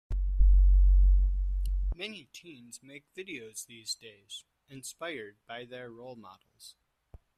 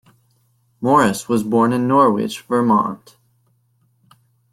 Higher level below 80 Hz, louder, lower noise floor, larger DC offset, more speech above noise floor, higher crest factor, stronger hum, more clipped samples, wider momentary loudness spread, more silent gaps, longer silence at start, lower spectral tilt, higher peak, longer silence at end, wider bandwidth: first, -28 dBFS vs -58 dBFS; second, -31 LUFS vs -17 LUFS; second, -57 dBFS vs -62 dBFS; neither; second, 13 dB vs 45 dB; about the same, 16 dB vs 16 dB; neither; neither; first, 24 LU vs 10 LU; neither; second, 0.1 s vs 0.8 s; second, -4.5 dB/octave vs -6 dB/octave; second, -12 dBFS vs -2 dBFS; second, 1.15 s vs 1.55 s; second, 10.5 kHz vs 15 kHz